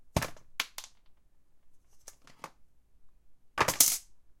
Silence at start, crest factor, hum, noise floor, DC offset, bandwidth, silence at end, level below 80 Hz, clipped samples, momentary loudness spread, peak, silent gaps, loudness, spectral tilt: 0 s; 30 dB; none; -59 dBFS; under 0.1%; 16.5 kHz; 0.1 s; -54 dBFS; under 0.1%; 27 LU; -6 dBFS; none; -29 LUFS; -1.5 dB/octave